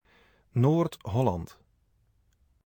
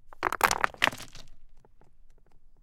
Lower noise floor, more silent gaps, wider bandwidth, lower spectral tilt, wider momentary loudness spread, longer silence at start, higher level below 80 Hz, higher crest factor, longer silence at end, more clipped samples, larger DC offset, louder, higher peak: first, -68 dBFS vs -51 dBFS; neither; first, 19.5 kHz vs 17 kHz; first, -8.5 dB/octave vs -1.5 dB/octave; second, 12 LU vs 19 LU; first, 0.55 s vs 0.05 s; about the same, -56 dBFS vs -52 dBFS; second, 18 dB vs 30 dB; first, 1.2 s vs 0.1 s; neither; neither; about the same, -28 LUFS vs -27 LUFS; second, -12 dBFS vs -2 dBFS